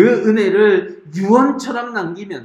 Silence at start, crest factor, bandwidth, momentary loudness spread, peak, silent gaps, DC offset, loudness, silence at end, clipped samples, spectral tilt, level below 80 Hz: 0 s; 14 dB; 10 kHz; 11 LU; 0 dBFS; none; under 0.1%; -15 LUFS; 0 s; under 0.1%; -6.5 dB/octave; -66 dBFS